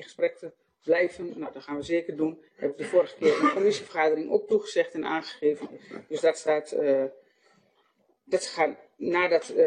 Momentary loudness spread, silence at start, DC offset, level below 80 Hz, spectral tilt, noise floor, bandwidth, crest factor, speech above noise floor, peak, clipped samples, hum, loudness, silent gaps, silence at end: 13 LU; 0 s; under 0.1%; -72 dBFS; -4.5 dB/octave; -68 dBFS; 10 kHz; 18 dB; 42 dB; -10 dBFS; under 0.1%; none; -27 LUFS; none; 0 s